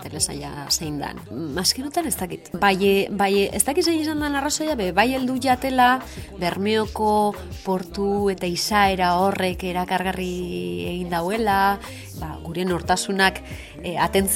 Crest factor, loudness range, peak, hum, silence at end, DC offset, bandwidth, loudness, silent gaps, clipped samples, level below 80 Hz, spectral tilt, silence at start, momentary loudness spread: 22 dB; 3 LU; 0 dBFS; none; 0 s; under 0.1%; 17 kHz; -22 LUFS; none; under 0.1%; -44 dBFS; -3.5 dB/octave; 0 s; 12 LU